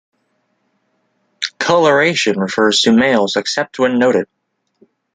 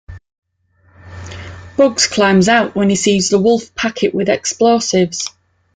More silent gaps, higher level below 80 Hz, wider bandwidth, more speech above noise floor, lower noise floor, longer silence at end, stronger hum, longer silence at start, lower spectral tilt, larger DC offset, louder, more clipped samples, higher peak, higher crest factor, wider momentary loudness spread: second, none vs 0.38-0.42 s; second, -60 dBFS vs -48 dBFS; about the same, 9.6 kHz vs 9.6 kHz; first, 52 dB vs 42 dB; first, -65 dBFS vs -55 dBFS; first, 0.9 s vs 0.45 s; neither; first, 1.4 s vs 0.1 s; about the same, -3.5 dB/octave vs -4 dB/octave; neither; about the same, -14 LUFS vs -14 LUFS; neither; about the same, -2 dBFS vs 0 dBFS; about the same, 14 dB vs 16 dB; second, 8 LU vs 18 LU